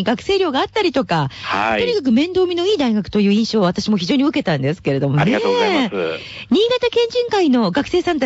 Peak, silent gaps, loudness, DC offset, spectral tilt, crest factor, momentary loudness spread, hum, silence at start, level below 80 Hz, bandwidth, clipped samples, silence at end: -8 dBFS; none; -17 LUFS; under 0.1%; -6 dB/octave; 10 dB; 4 LU; none; 0 s; -50 dBFS; 8 kHz; under 0.1%; 0 s